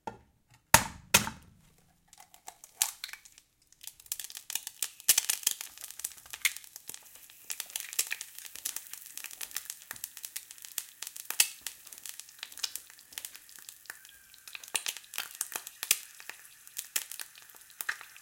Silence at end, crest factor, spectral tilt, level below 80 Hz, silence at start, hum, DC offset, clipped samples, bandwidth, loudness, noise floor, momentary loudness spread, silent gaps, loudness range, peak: 0 s; 36 dB; 0 dB/octave; -62 dBFS; 0.05 s; none; under 0.1%; under 0.1%; 17 kHz; -33 LUFS; -66 dBFS; 22 LU; none; 8 LU; -2 dBFS